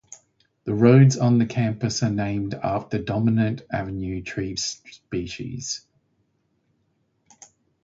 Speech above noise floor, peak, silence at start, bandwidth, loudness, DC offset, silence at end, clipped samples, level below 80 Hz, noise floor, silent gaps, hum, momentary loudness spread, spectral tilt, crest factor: 48 dB; -4 dBFS; 0.1 s; 7.8 kHz; -23 LUFS; under 0.1%; 2.05 s; under 0.1%; -50 dBFS; -69 dBFS; none; none; 15 LU; -6 dB/octave; 20 dB